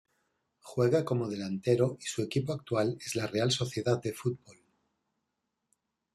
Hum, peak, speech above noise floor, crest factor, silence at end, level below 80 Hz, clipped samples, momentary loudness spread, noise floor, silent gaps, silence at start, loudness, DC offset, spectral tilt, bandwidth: none; -14 dBFS; 53 dB; 20 dB; 1.6 s; -68 dBFS; under 0.1%; 7 LU; -84 dBFS; none; 0.65 s; -31 LUFS; under 0.1%; -5.5 dB/octave; 13.5 kHz